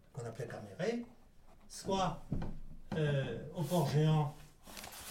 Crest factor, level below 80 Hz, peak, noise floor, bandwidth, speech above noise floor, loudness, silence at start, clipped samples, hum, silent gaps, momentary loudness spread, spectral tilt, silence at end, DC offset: 16 dB; -52 dBFS; -22 dBFS; -58 dBFS; 16.5 kHz; 23 dB; -37 LUFS; 0.15 s; under 0.1%; none; none; 19 LU; -6.5 dB/octave; 0 s; under 0.1%